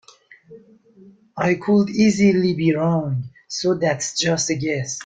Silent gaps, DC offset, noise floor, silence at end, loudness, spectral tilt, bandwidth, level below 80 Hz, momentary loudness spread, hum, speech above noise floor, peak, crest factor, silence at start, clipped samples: none; under 0.1%; -48 dBFS; 0 s; -20 LUFS; -5 dB/octave; 9.4 kHz; -56 dBFS; 9 LU; none; 29 dB; -4 dBFS; 16 dB; 0.5 s; under 0.1%